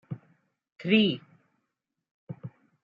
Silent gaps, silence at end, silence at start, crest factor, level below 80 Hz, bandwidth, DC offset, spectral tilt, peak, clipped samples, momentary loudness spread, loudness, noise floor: 0.72-0.76 s, 2.11-2.27 s; 0.35 s; 0.1 s; 22 dB; -74 dBFS; 5 kHz; under 0.1%; -8 dB/octave; -10 dBFS; under 0.1%; 22 LU; -26 LUFS; -83 dBFS